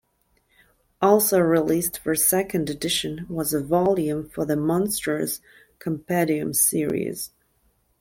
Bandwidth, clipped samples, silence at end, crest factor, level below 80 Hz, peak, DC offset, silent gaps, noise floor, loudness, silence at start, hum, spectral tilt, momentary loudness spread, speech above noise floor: 16.5 kHz; under 0.1%; 0.75 s; 18 dB; -56 dBFS; -4 dBFS; under 0.1%; none; -67 dBFS; -22 LUFS; 1 s; none; -4 dB/octave; 11 LU; 44 dB